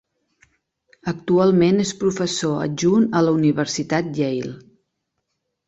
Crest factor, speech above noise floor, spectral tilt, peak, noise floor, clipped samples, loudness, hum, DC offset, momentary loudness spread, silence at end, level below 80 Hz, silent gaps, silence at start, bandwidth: 16 dB; 57 dB; -5.5 dB/octave; -4 dBFS; -76 dBFS; under 0.1%; -20 LUFS; none; under 0.1%; 12 LU; 1.1 s; -58 dBFS; none; 1.05 s; 8.2 kHz